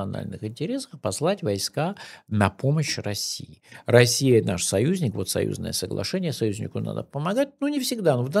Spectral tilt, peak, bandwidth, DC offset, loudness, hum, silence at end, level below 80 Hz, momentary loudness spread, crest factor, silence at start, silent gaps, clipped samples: -5 dB/octave; -2 dBFS; 15.5 kHz; under 0.1%; -24 LUFS; none; 0 s; -58 dBFS; 11 LU; 24 dB; 0 s; none; under 0.1%